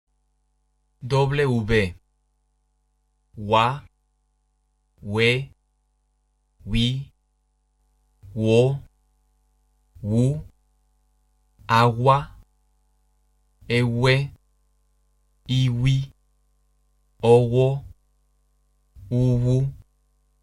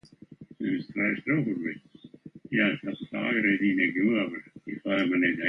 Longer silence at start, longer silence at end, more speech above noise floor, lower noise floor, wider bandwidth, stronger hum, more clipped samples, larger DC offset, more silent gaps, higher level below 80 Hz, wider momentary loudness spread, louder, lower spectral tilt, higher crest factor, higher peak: first, 1 s vs 0.4 s; first, 0.65 s vs 0 s; first, 49 dB vs 23 dB; first, -69 dBFS vs -50 dBFS; first, 11.5 kHz vs 6 kHz; first, 50 Hz at -55 dBFS vs none; neither; neither; neither; first, -44 dBFS vs -68 dBFS; first, 18 LU vs 12 LU; first, -22 LUFS vs -27 LUFS; about the same, -7 dB/octave vs -8 dB/octave; about the same, 20 dB vs 18 dB; first, -4 dBFS vs -10 dBFS